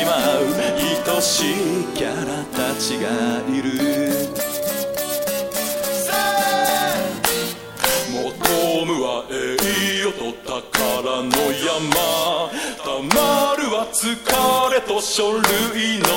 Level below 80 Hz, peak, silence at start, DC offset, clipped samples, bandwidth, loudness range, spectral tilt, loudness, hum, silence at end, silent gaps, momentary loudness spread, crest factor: -48 dBFS; 0 dBFS; 0 s; under 0.1%; under 0.1%; 16.5 kHz; 3 LU; -2.5 dB/octave; -20 LUFS; none; 0 s; none; 6 LU; 20 dB